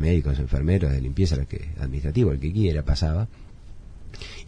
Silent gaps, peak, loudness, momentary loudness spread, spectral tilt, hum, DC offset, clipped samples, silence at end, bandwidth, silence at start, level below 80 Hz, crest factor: none; -8 dBFS; -25 LUFS; 10 LU; -7.5 dB/octave; none; under 0.1%; under 0.1%; 0 s; 10 kHz; 0 s; -30 dBFS; 16 dB